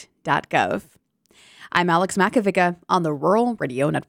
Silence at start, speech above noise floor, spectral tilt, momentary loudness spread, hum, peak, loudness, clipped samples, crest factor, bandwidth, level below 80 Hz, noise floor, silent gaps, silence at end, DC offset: 0 s; 35 dB; -5.5 dB/octave; 5 LU; none; -4 dBFS; -21 LUFS; under 0.1%; 18 dB; 16 kHz; -64 dBFS; -55 dBFS; none; 0.1 s; under 0.1%